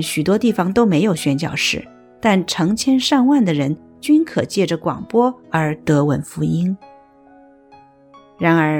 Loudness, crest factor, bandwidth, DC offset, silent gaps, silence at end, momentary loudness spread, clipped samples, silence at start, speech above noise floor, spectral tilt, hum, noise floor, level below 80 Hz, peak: -17 LUFS; 16 dB; 18.5 kHz; under 0.1%; none; 0 s; 6 LU; under 0.1%; 0 s; 30 dB; -5.5 dB/octave; none; -47 dBFS; -52 dBFS; -2 dBFS